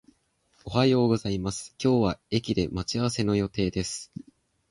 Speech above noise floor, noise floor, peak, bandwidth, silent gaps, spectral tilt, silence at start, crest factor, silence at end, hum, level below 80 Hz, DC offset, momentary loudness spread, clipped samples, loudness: 42 dB; -68 dBFS; -8 dBFS; 11.5 kHz; none; -5.5 dB/octave; 0.65 s; 18 dB; 0.65 s; none; -48 dBFS; under 0.1%; 11 LU; under 0.1%; -27 LUFS